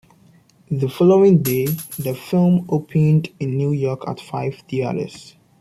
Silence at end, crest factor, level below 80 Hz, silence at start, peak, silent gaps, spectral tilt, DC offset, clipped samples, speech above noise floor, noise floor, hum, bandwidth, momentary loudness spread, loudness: 0.35 s; 16 dB; -56 dBFS; 0.7 s; -4 dBFS; none; -7.5 dB/octave; under 0.1%; under 0.1%; 34 dB; -52 dBFS; none; 15 kHz; 13 LU; -19 LUFS